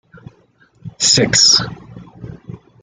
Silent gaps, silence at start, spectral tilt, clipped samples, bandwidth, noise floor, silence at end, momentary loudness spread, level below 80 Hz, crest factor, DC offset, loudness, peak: none; 0.85 s; -1.5 dB/octave; under 0.1%; 11.5 kHz; -53 dBFS; 0.25 s; 24 LU; -48 dBFS; 18 dB; under 0.1%; -11 LUFS; 0 dBFS